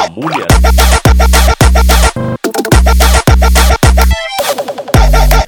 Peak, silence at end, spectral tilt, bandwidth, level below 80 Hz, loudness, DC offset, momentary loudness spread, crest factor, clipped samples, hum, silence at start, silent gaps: 0 dBFS; 0 s; -4.5 dB/octave; 19 kHz; -8 dBFS; -9 LUFS; under 0.1%; 7 LU; 8 dB; 0.4%; none; 0 s; none